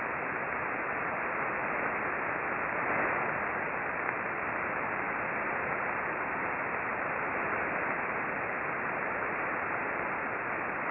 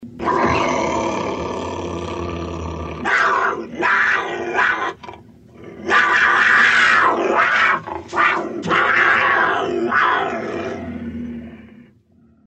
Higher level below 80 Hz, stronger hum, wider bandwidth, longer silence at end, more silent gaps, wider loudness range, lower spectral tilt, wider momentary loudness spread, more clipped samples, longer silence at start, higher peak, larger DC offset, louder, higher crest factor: second, -64 dBFS vs -46 dBFS; neither; second, 4.1 kHz vs 8.8 kHz; second, 0 s vs 0.8 s; neither; second, 1 LU vs 6 LU; first, -9.5 dB/octave vs -4 dB/octave; second, 2 LU vs 15 LU; neither; about the same, 0 s vs 0 s; second, -14 dBFS vs -2 dBFS; neither; second, -32 LUFS vs -17 LUFS; about the same, 20 dB vs 16 dB